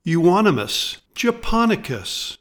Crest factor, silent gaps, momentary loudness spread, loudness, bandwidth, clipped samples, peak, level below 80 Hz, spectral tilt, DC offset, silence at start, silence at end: 16 dB; none; 10 LU; -20 LUFS; 19 kHz; under 0.1%; -4 dBFS; -36 dBFS; -5 dB/octave; under 0.1%; 0.05 s; 0.05 s